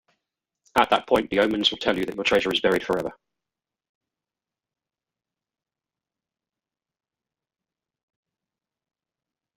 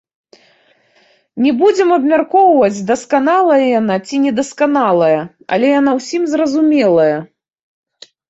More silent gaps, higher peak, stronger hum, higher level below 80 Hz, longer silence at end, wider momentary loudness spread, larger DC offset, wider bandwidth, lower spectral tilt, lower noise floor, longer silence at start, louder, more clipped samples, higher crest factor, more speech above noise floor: neither; about the same, -4 dBFS vs -2 dBFS; neither; about the same, -58 dBFS vs -60 dBFS; first, 6.45 s vs 1.05 s; about the same, 6 LU vs 6 LU; neither; first, 16 kHz vs 8.2 kHz; second, -4 dB/octave vs -5.5 dB/octave; first, under -90 dBFS vs -54 dBFS; second, 0.75 s vs 1.35 s; second, -22 LUFS vs -13 LUFS; neither; first, 24 dB vs 12 dB; first, over 67 dB vs 41 dB